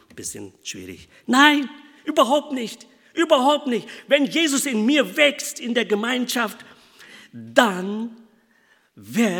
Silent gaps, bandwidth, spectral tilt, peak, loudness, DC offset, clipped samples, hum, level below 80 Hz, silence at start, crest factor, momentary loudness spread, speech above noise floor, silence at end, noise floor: none; 19 kHz; -3 dB/octave; 0 dBFS; -20 LUFS; under 0.1%; under 0.1%; none; -70 dBFS; 0.15 s; 22 dB; 18 LU; 39 dB; 0 s; -60 dBFS